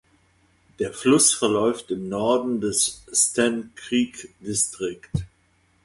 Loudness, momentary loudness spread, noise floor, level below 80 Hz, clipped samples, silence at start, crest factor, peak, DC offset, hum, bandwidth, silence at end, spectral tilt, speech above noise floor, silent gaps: -22 LUFS; 14 LU; -63 dBFS; -52 dBFS; under 0.1%; 0.8 s; 20 dB; -4 dBFS; under 0.1%; none; 12 kHz; 0.6 s; -3 dB/octave; 40 dB; none